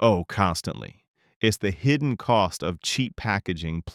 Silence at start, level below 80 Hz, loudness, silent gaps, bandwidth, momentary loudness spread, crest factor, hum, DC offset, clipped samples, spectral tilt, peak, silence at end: 0 s; -50 dBFS; -25 LUFS; 1.08-1.14 s, 1.36-1.41 s; 16 kHz; 8 LU; 20 dB; none; under 0.1%; under 0.1%; -5 dB/octave; -6 dBFS; 0 s